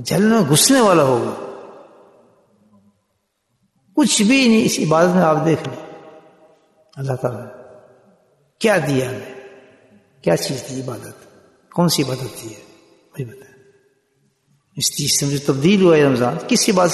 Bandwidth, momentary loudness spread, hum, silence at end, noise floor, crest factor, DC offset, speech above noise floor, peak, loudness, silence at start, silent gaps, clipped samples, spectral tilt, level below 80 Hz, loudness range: 12.5 kHz; 21 LU; none; 0 s; -70 dBFS; 18 dB; under 0.1%; 53 dB; -2 dBFS; -16 LUFS; 0 s; none; under 0.1%; -4.5 dB/octave; -58 dBFS; 8 LU